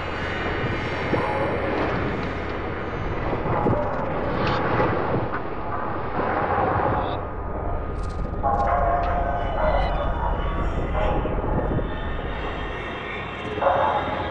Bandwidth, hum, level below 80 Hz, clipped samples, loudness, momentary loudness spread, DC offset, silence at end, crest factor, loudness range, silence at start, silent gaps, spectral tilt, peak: 8.2 kHz; none; -32 dBFS; under 0.1%; -25 LUFS; 8 LU; under 0.1%; 0 s; 16 dB; 2 LU; 0 s; none; -8 dB/octave; -8 dBFS